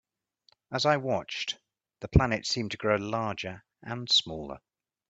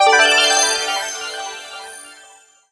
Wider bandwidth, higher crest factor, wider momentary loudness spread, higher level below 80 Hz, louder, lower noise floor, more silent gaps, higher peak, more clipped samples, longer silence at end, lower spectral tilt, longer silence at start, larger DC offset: second, 9 kHz vs 11 kHz; first, 26 dB vs 18 dB; second, 17 LU vs 22 LU; first, -44 dBFS vs -62 dBFS; second, -28 LUFS vs -14 LUFS; first, -68 dBFS vs -47 dBFS; neither; second, -4 dBFS vs 0 dBFS; neither; about the same, 0.55 s vs 0.55 s; first, -4.5 dB/octave vs 2.5 dB/octave; first, 0.7 s vs 0 s; neither